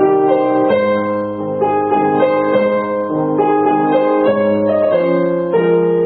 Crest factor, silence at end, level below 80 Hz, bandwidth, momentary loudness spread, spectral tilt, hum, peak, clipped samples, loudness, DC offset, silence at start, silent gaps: 12 dB; 0 s; -54 dBFS; 4.5 kHz; 4 LU; -12.5 dB/octave; none; -2 dBFS; under 0.1%; -14 LUFS; under 0.1%; 0 s; none